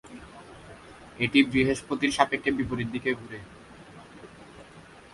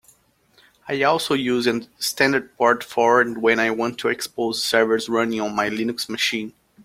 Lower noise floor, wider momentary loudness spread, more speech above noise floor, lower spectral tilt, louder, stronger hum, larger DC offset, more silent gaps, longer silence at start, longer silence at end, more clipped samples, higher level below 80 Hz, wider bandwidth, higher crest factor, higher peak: second, -50 dBFS vs -59 dBFS; first, 25 LU vs 7 LU; second, 24 dB vs 38 dB; first, -5 dB/octave vs -3.5 dB/octave; second, -26 LUFS vs -21 LUFS; neither; neither; neither; second, 0.05 s vs 0.85 s; about the same, 0.3 s vs 0.35 s; neither; first, -54 dBFS vs -62 dBFS; second, 11.5 kHz vs 16.5 kHz; first, 26 dB vs 20 dB; about the same, -4 dBFS vs -2 dBFS